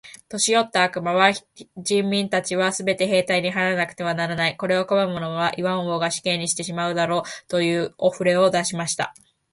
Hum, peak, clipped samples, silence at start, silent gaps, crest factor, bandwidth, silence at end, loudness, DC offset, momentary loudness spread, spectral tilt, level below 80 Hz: none; -2 dBFS; under 0.1%; 0.05 s; none; 20 dB; 11.5 kHz; 0.4 s; -22 LUFS; under 0.1%; 6 LU; -3.5 dB/octave; -64 dBFS